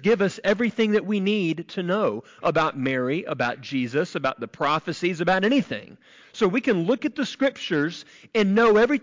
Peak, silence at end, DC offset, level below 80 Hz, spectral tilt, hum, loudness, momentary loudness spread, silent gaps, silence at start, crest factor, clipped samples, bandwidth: -12 dBFS; 0.05 s; under 0.1%; -62 dBFS; -6 dB/octave; none; -23 LUFS; 7 LU; none; 0 s; 12 dB; under 0.1%; 7.6 kHz